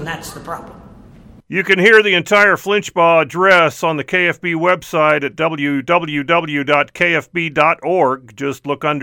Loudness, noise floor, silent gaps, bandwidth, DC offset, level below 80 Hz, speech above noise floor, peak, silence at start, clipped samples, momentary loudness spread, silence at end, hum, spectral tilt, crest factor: -14 LUFS; -41 dBFS; none; 18.5 kHz; under 0.1%; -52 dBFS; 26 dB; 0 dBFS; 0 s; under 0.1%; 12 LU; 0 s; none; -4.5 dB/octave; 16 dB